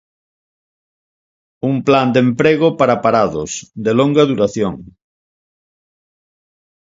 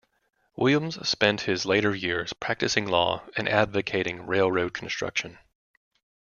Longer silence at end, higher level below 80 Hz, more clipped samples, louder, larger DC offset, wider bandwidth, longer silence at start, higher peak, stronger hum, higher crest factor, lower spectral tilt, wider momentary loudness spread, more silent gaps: first, 1.95 s vs 1.05 s; first, -52 dBFS vs -60 dBFS; neither; first, -15 LUFS vs -25 LUFS; neither; about the same, 7.8 kHz vs 7.2 kHz; first, 1.65 s vs 0.6 s; first, 0 dBFS vs -4 dBFS; neither; second, 18 dB vs 24 dB; first, -6 dB/octave vs -4 dB/octave; first, 10 LU vs 7 LU; neither